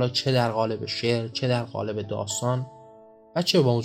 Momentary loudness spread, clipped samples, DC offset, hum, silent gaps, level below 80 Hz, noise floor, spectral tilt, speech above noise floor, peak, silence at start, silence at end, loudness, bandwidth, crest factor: 9 LU; under 0.1%; under 0.1%; none; none; -68 dBFS; -50 dBFS; -5 dB/octave; 26 dB; -8 dBFS; 0 s; 0 s; -26 LUFS; 15.5 kHz; 18 dB